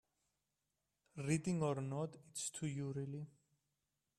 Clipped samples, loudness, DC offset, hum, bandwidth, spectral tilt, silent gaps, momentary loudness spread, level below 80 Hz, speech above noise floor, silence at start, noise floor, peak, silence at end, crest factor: under 0.1%; -42 LUFS; under 0.1%; none; 13.5 kHz; -5.5 dB/octave; none; 11 LU; -76 dBFS; 47 dB; 1.15 s; -89 dBFS; -22 dBFS; 0.9 s; 22 dB